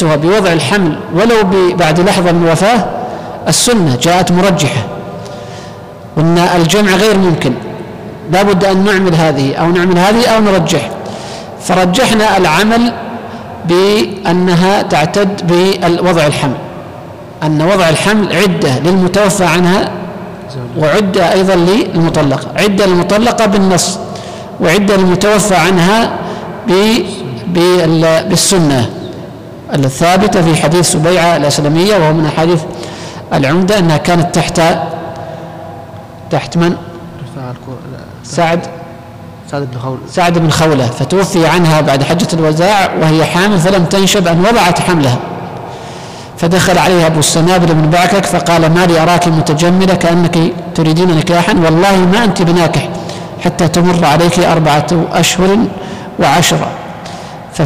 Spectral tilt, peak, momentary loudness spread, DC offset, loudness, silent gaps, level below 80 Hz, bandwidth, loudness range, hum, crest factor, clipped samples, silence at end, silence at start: -5 dB/octave; -2 dBFS; 16 LU; under 0.1%; -10 LUFS; none; -36 dBFS; 16 kHz; 3 LU; none; 8 dB; under 0.1%; 0 s; 0 s